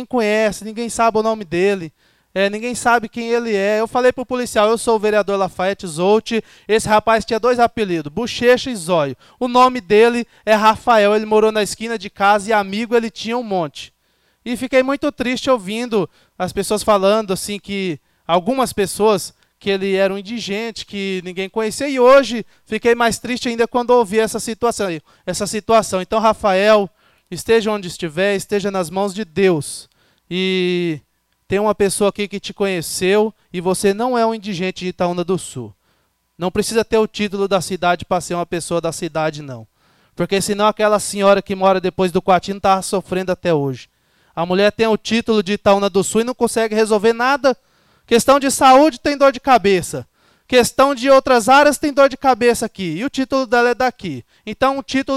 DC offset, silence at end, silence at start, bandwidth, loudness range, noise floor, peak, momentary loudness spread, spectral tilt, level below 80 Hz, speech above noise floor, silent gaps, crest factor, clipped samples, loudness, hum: under 0.1%; 0 s; 0 s; 16 kHz; 6 LU; -63 dBFS; -4 dBFS; 11 LU; -4.5 dB/octave; -48 dBFS; 47 dB; none; 14 dB; under 0.1%; -17 LUFS; none